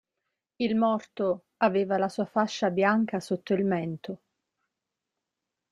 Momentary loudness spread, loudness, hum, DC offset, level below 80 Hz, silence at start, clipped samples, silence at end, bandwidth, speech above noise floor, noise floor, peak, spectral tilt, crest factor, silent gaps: 8 LU; -27 LUFS; none; under 0.1%; -72 dBFS; 0.6 s; under 0.1%; 1.55 s; 11.5 kHz; 59 dB; -86 dBFS; -8 dBFS; -6.5 dB/octave; 20 dB; none